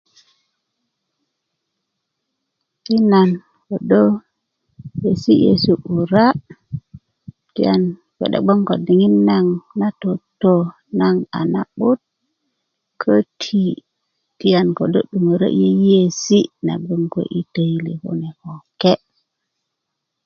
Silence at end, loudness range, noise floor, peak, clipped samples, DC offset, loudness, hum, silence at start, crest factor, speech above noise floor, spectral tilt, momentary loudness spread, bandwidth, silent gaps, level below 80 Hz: 1.3 s; 5 LU; -78 dBFS; 0 dBFS; under 0.1%; under 0.1%; -17 LUFS; none; 2.9 s; 18 dB; 62 dB; -7 dB/octave; 13 LU; 7 kHz; none; -56 dBFS